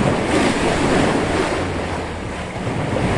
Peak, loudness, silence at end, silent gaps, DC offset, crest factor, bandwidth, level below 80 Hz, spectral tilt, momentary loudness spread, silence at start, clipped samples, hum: -4 dBFS; -20 LUFS; 0 s; none; under 0.1%; 14 dB; 11.5 kHz; -34 dBFS; -5.5 dB/octave; 9 LU; 0 s; under 0.1%; none